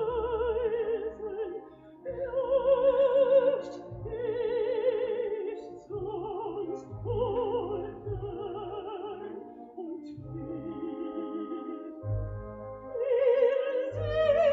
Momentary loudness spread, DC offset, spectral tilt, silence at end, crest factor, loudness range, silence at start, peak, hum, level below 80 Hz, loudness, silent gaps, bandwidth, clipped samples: 17 LU; under 0.1%; -6 dB/octave; 0 s; 16 dB; 11 LU; 0 s; -14 dBFS; none; -52 dBFS; -31 LUFS; none; 4.9 kHz; under 0.1%